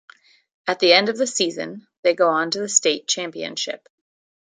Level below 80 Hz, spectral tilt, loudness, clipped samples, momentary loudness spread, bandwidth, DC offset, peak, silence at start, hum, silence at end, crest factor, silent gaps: -76 dBFS; -1.5 dB/octave; -20 LUFS; under 0.1%; 14 LU; 9.8 kHz; under 0.1%; 0 dBFS; 0.65 s; none; 0.75 s; 22 dB; 1.97-2.03 s